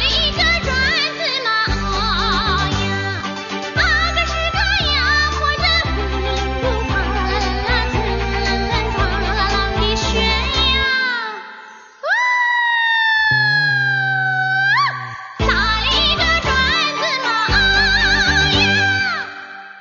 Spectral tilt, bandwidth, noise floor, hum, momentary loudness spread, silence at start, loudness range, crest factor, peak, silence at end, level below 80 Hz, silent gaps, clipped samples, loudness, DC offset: -3.5 dB/octave; 7.4 kHz; -39 dBFS; none; 7 LU; 0 s; 4 LU; 16 dB; -2 dBFS; 0 s; -26 dBFS; none; under 0.1%; -16 LUFS; under 0.1%